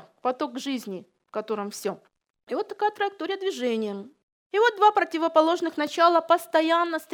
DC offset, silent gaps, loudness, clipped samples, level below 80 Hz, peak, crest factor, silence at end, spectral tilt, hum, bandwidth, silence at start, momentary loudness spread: under 0.1%; 2.30-2.34 s, 2.43-2.47 s, 4.23-4.50 s; -25 LUFS; under 0.1%; -86 dBFS; -6 dBFS; 20 dB; 0 s; -3.5 dB/octave; none; 19.5 kHz; 0.25 s; 13 LU